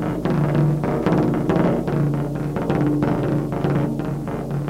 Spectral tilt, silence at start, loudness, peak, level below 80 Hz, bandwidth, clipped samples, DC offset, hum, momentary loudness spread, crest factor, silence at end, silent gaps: -9 dB/octave; 0 s; -21 LUFS; -8 dBFS; -40 dBFS; 14 kHz; under 0.1%; under 0.1%; none; 5 LU; 12 dB; 0 s; none